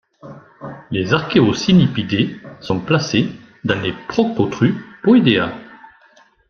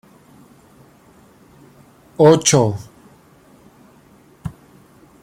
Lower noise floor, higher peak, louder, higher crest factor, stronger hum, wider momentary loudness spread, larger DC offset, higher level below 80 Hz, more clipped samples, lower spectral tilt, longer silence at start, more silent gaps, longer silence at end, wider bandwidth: about the same, -52 dBFS vs -50 dBFS; about the same, 0 dBFS vs 0 dBFS; second, -17 LUFS vs -14 LUFS; about the same, 18 dB vs 20 dB; neither; second, 13 LU vs 23 LU; neither; about the same, -50 dBFS vs -54 dBFS; neither; first, -6.5 dB/octave vs -4.5 dB/octave; second, 0.25 s vs 2.2 s; neither; about the same, 0.75 s vs 0.7 s; second, 7 kHz vs 16 kHz